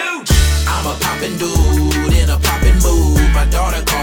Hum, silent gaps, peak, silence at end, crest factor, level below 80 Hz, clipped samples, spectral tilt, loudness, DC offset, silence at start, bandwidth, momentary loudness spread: none; none; 0 dBFS; 0 s; 12 dB; -14 dBFS; under 0.1%; -4.5 dB/octave; -14 LUFS; under 0.1%; 0 s; over 20 kHz; 5 LU